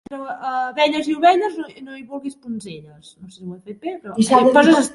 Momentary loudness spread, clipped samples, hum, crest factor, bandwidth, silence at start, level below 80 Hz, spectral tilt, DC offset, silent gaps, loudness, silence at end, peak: 23 LU; under 0.1%; none; 18 dB; 11.5 kHz; 0.1 s; -62 dBFS; -4.5 dB/octave; under 0.1%; none; -16 LUFS; 0 s; 0 dBFS